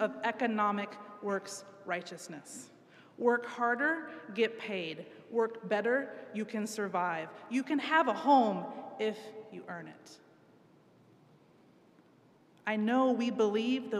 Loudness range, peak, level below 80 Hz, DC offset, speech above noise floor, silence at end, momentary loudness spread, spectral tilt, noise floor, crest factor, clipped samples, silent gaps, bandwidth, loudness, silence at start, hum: 13 LU; -14 dBFS; under -90 dBFS; under 0.1%; 31 dB; 0 s; 17 LU; -4.5 dB/octave; -63 dBFS; 20 dB; under 0.1%; none; 13.5 kHz; -32 LUFS; 0 s; none